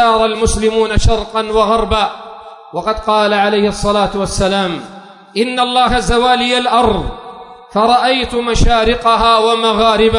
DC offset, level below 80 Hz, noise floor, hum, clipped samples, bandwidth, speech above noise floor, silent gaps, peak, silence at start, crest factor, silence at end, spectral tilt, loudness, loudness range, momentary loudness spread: under 0.1%; -24 dBFS; -33 dBFS; none; under 0.1%; 11 kHz; 21 dB; none; 0 dBFS; 0 s; 12 dB; 0 s; -4.5 dB/octave; -13 LUFS; 2 LU; 12 LU